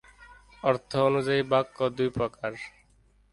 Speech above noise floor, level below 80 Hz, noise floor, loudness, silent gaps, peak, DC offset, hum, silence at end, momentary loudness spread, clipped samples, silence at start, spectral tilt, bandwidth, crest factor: 36 dB; -58 dBFS; -62 dBFS; -27 LUFS; none; -10 dBFS; under 0.1%; 50 Hz at -60 dBFS; 0.65 s; 11 LU; under 0.1%; 0.2 s; -6.5 dB/octave; 11.5 kHz; 18 dB